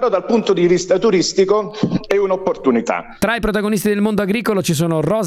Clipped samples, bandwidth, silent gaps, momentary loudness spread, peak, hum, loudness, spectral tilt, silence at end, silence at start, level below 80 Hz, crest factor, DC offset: under 0.1%; 16 kHz; none; 4 LU; 0 dBFS; none; -17 LUFS; -5.5 dB/octave; 0 s; 0 s; -42 dBFS; 16 dB; under 0.1%